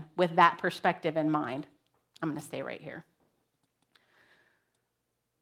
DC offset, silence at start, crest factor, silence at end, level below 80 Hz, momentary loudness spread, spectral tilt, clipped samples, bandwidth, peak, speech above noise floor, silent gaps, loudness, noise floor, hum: under 0.1%; 0 s; 26 dB; 2.4 s; -80 dBFS; 20 LU; -6 dB/octave; under 0.1%; 16 kHz; -6 dBFS; 52 dB; none; -30 LUFS; -82 dBFS; none